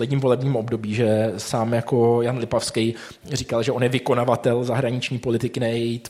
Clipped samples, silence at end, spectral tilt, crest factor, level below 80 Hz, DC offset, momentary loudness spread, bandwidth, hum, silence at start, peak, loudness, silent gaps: under 0.1%; 0 s; -6 dB/octave; 18 dB; -56 dBFS; under 0.1%; 5 LU; 15 kHz; none; 0 s; -4 dBFS; -22 LUFS; none